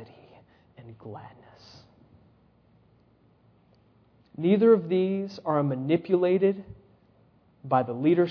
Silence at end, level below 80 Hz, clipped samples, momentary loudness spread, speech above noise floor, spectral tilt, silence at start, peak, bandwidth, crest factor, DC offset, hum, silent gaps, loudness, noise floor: 0 s; -68 dBFS; under 0.1%; 24 LU; 37 dB; -9.5 dB/octave; 0 s; -10 dBFS; 5.4 kHz; 18 dB; under 0.1%; none; none; -25 LUFS; -62 dBFS